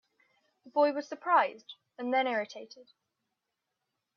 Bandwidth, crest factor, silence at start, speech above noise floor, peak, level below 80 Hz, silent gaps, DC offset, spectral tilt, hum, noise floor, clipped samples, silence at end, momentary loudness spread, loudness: 6.8 kHz; 20 dB; 0.65 s; 55 dB; -12 dBFS; -90 dBFS; none; under 0.1%; -4 dB/octave; none; -86 dBFS; under 0.1%; 1.35 s; 22 LU; -30 LUFS